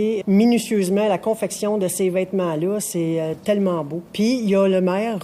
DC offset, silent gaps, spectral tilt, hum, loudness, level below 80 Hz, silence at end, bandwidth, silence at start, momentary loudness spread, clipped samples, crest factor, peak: under 0.1%; none; -5.5 dB/octave; none; -20 LUFS; -62 dBFS; 0 s; 15.5 kHz; 0 s; 6 LU; under 0.1%; 12 dB; -8 dBFS